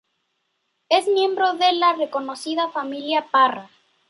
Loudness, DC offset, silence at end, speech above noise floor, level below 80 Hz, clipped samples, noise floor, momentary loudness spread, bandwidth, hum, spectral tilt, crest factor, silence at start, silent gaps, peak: -20 LUFS; under 0.1%; 0.45 s; 53 dB; -80 dBFS; under 0.1%; -73 dBFS; 9 LU; 11.5 kHz; none; -2.5 dB/octave; 18 dB; 0.9 s; none; -4 dBFS